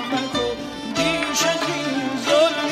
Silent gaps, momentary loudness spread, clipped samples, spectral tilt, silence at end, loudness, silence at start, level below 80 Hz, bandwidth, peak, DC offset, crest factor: none; 8 LU; under 0.1%; -3 dB/octave; 0 s; -21 LUFS; 0 s; -50 dBFS; 16 kHz; -6 dBFS; under 0.1%; 16 dB